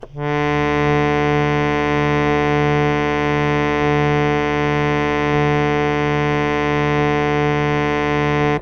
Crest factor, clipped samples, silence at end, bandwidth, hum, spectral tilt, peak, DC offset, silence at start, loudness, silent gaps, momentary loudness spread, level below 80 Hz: 14 dB; under 0.1%; 0 s; 7.2 kHz; none; -7 dB/octave; -4 dBFS; under 0.1%; 0 s; -17 LUFS; none; 1 LU; -36 dBFS